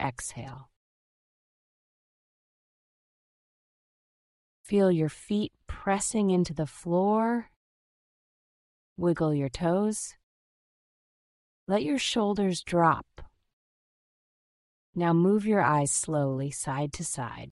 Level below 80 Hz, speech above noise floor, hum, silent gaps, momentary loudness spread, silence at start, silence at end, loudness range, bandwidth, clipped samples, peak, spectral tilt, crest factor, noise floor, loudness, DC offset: -56 dBFS; over 63 dB; none; 0.76-4.64 s, 7.56-8.96 s, 10.23-11.67 s, 13.53-14.93 s; 11 LU; 0 s; 0 s; 4 LU; 12 kHz; under 0.1%; -10 dBFS; -5 dB/octave; 20 dB; under -90 dBFS; -28 LUFS; under 0.1%